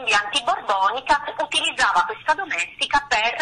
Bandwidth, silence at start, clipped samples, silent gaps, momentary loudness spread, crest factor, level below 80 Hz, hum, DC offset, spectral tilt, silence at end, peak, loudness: 10.5 kHz; 0 s; under 0.1%; none; 4 LU; 16 dB; -52 dBFS; none; under 0.1%; -0.5 dB/octave; 0 s; -6 dBFS; -21 LUFS